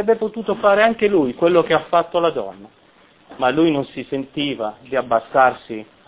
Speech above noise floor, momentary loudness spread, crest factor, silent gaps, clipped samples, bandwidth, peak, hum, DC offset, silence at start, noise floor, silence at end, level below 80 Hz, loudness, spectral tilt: 30 dB; 12 LU; 18 dB; none; under 0.1%; 4 kHz; 0 dBFS; none; under 0.1%; 0 s; -48 dBFS; 0.25 s; -56 dBFS; -18 LUFS; -9.5 dB/octave